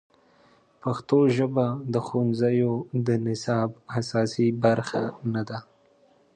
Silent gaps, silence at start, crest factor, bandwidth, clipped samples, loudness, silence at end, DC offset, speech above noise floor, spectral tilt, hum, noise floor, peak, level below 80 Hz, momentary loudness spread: none; 0.85 s; 18 dB; 9.6 kHz; under 0.1%; -25 LUFS; 0.75 s; under 0.1%; 36 dB; -7.5 dB/octave; none; -60 dBFS; -8 dBFS; -64 dBFS; 9 LU